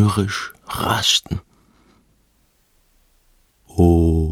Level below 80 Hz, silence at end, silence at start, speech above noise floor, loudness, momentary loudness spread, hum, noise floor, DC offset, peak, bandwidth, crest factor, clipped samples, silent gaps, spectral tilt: -32 dBFS; 0 s; 0 s; 44 dB; -19 LUFS; 15 LU; none; -61 dBFS; under 0.1%; -2 dBFS; 17 kHz; 20 dB; under 0.1%; none; -5 dB/octave